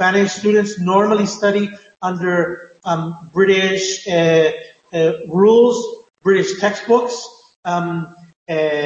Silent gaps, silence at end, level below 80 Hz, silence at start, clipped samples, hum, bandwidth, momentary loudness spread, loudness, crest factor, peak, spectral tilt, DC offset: 7.56-7.63 s, 8.36-8.46 s; 0 s; -62 dBFS; 0 s; under 0.1%; none; 8.2 kHz; 13 LU; -17 LUFS; 14 dB; -2 dBFS; -5 dB/octave; under 0.1%